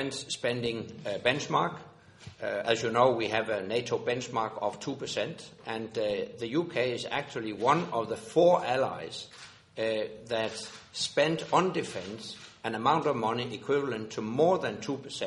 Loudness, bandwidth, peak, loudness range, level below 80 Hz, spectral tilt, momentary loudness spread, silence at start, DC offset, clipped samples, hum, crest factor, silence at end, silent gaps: -30 LUFS; 11.5 kHz; -10 dBFS; 4 LU; -68 dBFS; -4.5 dB/octave; 13 LU; 0 s; under 0.1%; under 0.1%; none; 20 dB; 0 s; none